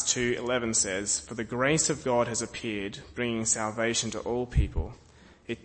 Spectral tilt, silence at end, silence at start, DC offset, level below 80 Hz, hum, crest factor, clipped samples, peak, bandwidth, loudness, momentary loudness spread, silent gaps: -3 dB/octave; 0.05 s; 0 s; under 0.1%; -40 dBFS; none; 20 dB; under 0.1%; -10 dBFS; 8.8 kHz; -28 LUFS; 10 LU; none